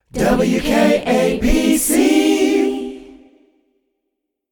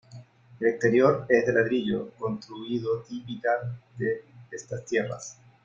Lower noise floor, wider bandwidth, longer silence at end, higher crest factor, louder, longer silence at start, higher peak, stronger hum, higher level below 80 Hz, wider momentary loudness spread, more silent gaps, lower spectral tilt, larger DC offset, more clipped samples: first, -76 dBFS vs -49 dBFS; first, 19 kHz vs 7.6 kHz; first, 1.45 s vs 0.3 s; second, 14 dB vs 20 dB; first, -15 LUFS vs -27 LUFS; about the same, 0.15 s vs 0.1 s; first, -2 dBFS vs -6 dBFS; neither; first, -32 dBFS vs -64 dBFS; second, 5 LU vs 16 LU; neither; second, -4.5 dB/octave vs -6 dB/octave; neither; neither